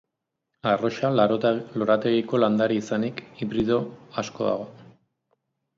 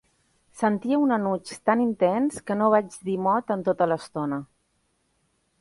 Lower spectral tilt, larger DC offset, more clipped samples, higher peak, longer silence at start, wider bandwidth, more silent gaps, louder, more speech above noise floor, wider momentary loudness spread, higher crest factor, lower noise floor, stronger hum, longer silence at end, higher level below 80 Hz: about the same, -6.5 dB/octave vs -6.5 dB/octave; neither; neither; about the same, -8 dBFS vs -6 dBFS; about the same, 0.65 s vs 0.55 s; second, 7.6 kHz vs 11.5 kHz; neither; about the same, -24 LUFS vs -25 LUFS; first, 58 dB vs 47 dB; first, 11 LU vs 8 LU; about the same, 18 dB vs 18 dB; first, -82 dBFS vs -71 dBFS; neither; second, 0.95 s vs 1.15 s; about the same, -62 dBFS vs -66 dBFS